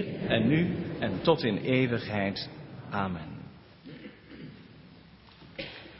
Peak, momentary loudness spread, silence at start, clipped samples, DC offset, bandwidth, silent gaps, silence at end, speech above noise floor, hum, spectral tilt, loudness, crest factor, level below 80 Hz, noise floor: -8 dBFS; 22 LU; 0 s; under 0.1%; under 0.1%; 5.8 kHz; none; 0 s; 26 dB; none; -10.5 dB/octave; -29 LUFS; 24 dB; -56 dBFS; -53 dBFS